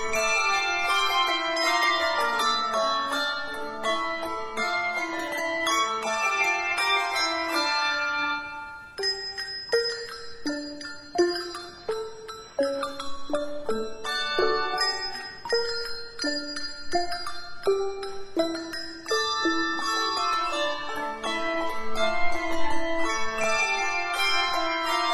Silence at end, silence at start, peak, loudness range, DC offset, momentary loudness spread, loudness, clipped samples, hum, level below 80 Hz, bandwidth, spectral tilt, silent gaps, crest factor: 0 s; 0 s; -10 dBFS; 6 LU; under 0.1%; 10 LU; -26 LUFS; under 0.1%; none; -50 dBFS; 15 kHz; -1.5 dB/octave; none; 16 dB